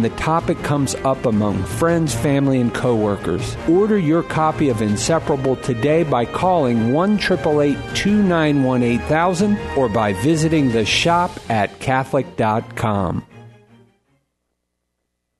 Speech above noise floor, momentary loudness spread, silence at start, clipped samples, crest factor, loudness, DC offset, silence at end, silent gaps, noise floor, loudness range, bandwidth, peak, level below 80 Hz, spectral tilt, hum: 57 dB; 5 LU; 0 s; under 0.1%; 14 dB; -18 LUFS; under 0.1%; 1.9 s; none; -75 dBFS; 4 LU; 12.5 kHz; -4 dBFS; -40 dBFS; -6 dB/octave; none